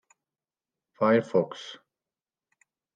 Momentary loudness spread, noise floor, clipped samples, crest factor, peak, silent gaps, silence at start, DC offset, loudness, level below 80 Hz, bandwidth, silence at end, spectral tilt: 18 LU; under -90 dBFS; under 0.1%; 20 dB; -12 dBFS; none; 1 s; under 0.1%; -26 LUFS; -82 dBFS; 9 kHz; 1.2 s; -6.5 dB/octave